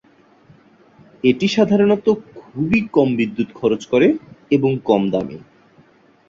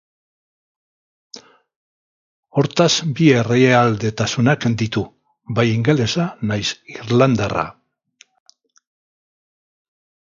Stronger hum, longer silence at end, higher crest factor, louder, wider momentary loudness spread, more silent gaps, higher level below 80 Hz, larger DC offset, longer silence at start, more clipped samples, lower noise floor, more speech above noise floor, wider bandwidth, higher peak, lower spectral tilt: neither; second, 0.9 s vs 2.55 s; about the same, 16 dB vs 20 dB; about the same, -18 LUFS vs -17 LUFS; about the same, 10 LU vs 11 LU; second, none vs 1.76-2.43 s; about the same, -54 dBFS vs -52 dBFS; neither; about the same, 1.25 s vs 1.35 s; neither; about the same, -52 dBFS vs -54 dBFS; about the same, 35 dB vs 38 dB; about the same, 7.6 kHz vs 7.6 kHz; about the same, -2 dBFS vs 0 dBFS; first, -7 dB/octave vs -5.5 dB/octave